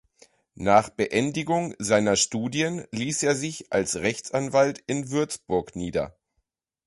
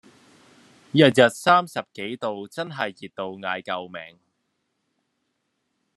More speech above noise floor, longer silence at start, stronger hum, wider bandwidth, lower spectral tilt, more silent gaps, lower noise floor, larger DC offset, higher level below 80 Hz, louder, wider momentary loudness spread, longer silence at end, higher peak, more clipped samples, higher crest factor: about the same, 52 dB vs 53 dB; second, 0.6 s vs 0.95 s; neither; about the same, 11.5 kHz vs 12.5 kHz; about the same, -4 dB/octave vs -5 dB/octave; neither; about the same, -77 dBFS vs -75 dBFS; neither; first, -56 dBFS vs -74 dBFS; second, -25 LUFS vs -22 LUFS; second, 9 LU vs 17 LU; second, 0.75 s vs 1.9 s; second, -6 dBFS vs -2 dBFS; neither; about the same, 20 dB vs 24 dB